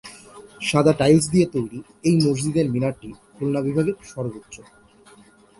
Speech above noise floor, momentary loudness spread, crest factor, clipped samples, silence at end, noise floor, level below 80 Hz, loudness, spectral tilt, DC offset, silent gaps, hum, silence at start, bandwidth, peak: 30 dB; 22 LU; 20 dB; under 0.1%; 1 s; -51 dBFS; -52 dBFS; -21 LUFS; -6 dB/octave; under 0.1%; none; none; 0.05 s; 11.5 kHz; -4 dBFS